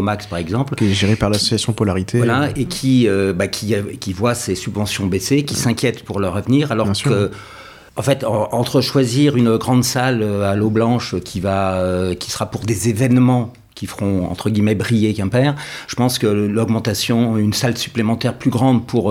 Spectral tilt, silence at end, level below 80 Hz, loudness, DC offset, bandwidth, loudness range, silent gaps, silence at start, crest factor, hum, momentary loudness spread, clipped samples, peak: -5.5 dB/octave; 0 s; -46 dBFS; -17 LUFS; under 0.1%; 16.5 kHz; 2 LU; none; 0 s; 14 dB; none; 7 LU; under 0.1%; -2 dBFS